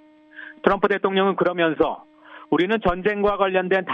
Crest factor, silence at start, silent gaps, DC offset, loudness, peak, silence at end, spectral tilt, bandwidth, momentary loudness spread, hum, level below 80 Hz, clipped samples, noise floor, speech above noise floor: 20 dB; 0.35 s; none; under 0.1%; -21 LUFS; -2 dBFS; 0 s; -7.5 dB/octave; 5.8 kHz; 5 LU; none; -46 dBFS; under 0.1%; -43 dBFS; 22 dB